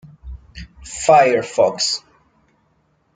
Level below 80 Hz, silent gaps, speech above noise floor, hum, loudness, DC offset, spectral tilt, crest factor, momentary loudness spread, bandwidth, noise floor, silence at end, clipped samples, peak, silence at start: -44 dBFS; none; 47 dB; none; -16 LUFS; under 0.1%; -2.5 dB/octave; 18 dB; 26 LU; 9.6 kHz; -62 dBFS; 1.15 s; under 0.1%; -2 dBFS; 0.25 s